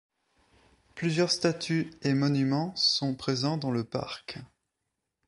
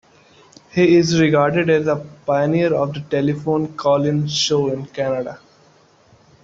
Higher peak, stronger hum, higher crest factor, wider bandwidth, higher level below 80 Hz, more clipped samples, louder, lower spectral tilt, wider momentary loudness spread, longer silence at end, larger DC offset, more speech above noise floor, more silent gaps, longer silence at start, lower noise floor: second, -10 dBFS vs -2 dBFS; neither; about the same, 20 dB vs 16 dB; first, 11.5 kHz vs 7.8 kHz; second, -66 dBFS vs -56 dBFS; neither; second, -28 LUFS vs -18 LUFS; about the same, -5 dB/octave vs -5.5 dB/octave; first, 14 LU vs 9 LU; second, 0.8 s vs 1.05 s; neither; first, 55 dB vs 35 dB; neither; first, 0.95 s vs 0.75 s; first, -84 dBFS vs -52 dBFS